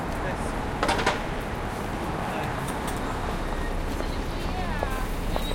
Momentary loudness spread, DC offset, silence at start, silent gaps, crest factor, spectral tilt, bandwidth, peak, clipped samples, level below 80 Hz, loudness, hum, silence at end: 6 LU; under 0.1%; 0 s; none; 20 dB; -5 dB/octave; 17 kHz; -8 dBFS; under 0.1%; -34 dBFS; -29 LUFS; none; 0 s